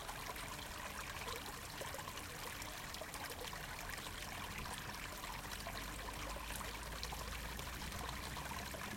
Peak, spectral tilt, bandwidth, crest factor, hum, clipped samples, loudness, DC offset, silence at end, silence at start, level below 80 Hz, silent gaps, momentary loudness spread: -26 dBFS; -2.5 dB/octave; 17 kHz; 22 dB; none; under 0.1%; -46 LUFS; under 0.1%; 0 s; 0 s; -54 dBFS; none; 2 LU